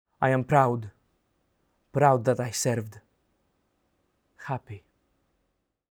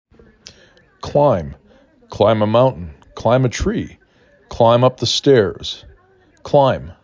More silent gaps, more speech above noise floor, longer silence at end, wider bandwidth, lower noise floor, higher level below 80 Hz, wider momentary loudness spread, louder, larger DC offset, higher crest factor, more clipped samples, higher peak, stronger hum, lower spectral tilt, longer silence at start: neither; first, 52 dB vs 38 dB; first, 1.15 s vs 0.1 s; first, 19.5 kHz vs 7.6 kHz; first, -77 dBFS vs -53 dBFS; second, -66 dBFS vs -38 dBFS; about the same, 22 LU vs 20 LU; second, -26 LUFS vs -16 LUFS; neither; first, 22 dB vs 16 dB; neither; second, -6 dBFS vs 0 dBFS; neither; about the same, -5.5 dB/octave vs -6 dB/octave; second, 0.2 s vs 1.05 s